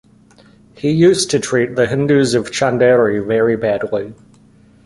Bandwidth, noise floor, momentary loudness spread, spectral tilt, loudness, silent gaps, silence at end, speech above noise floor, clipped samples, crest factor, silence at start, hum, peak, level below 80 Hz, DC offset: 11.5 kHz; -47 dBFS; 9 LU; -5 dB/octave; -15 LUFS; none; 0.75 s; 33 dB; under 0.1%; 14 dB; 0.85 s; none; -2 dBFS; -50 dBFS; under 0.1%